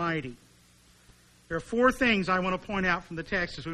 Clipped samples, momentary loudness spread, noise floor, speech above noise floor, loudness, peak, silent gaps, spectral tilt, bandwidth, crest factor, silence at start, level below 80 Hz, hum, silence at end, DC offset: under 0.1%; 12 LU; -59 dBFS; 31 dB; -28 LUFS; -10 dBFS; none; -5.5 dB/octave; 13 kHz; 20 dB; 0 s; -50 dBFS; 60 Hz at -60 dBFS; 0 s; under 0.1%